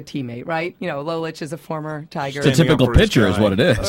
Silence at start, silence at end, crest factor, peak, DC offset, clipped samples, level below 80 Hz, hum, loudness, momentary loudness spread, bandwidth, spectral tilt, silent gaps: 0 s; 0 s; 18 dB; 0 dBFS; under 0.1%; under 0.1%; -32 dBFS; none; -19 LUFS; 14 LU; 16 kHz; -6 dB/octave; none